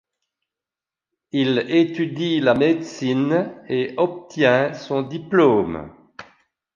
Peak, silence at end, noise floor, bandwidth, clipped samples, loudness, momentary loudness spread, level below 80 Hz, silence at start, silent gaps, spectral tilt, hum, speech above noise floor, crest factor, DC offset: -4 dBFS; 0.55 s; -89 dBFS; 7.4 kHz; under 0.1%; -20 LUFS; 8 LU; -58 dBFS; 1.35 s; none; -6.5 dB/octave; none; 70 dB; 18 dB; under 0.1%